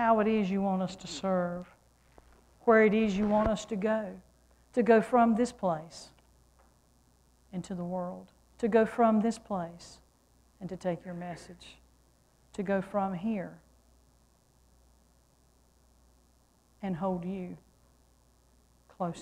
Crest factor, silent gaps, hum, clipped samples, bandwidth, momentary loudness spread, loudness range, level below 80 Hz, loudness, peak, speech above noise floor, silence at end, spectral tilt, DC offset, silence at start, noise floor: 20 dB; none; none; under 0.1%; 10.5 kHz; 21 LU; 13 LU; -58 dBFS; -30 LUFS; -12 dBFS; 37 dB; 0 s; -6.5 dB/octave; under 0.1%; 0 s; -66 dBFS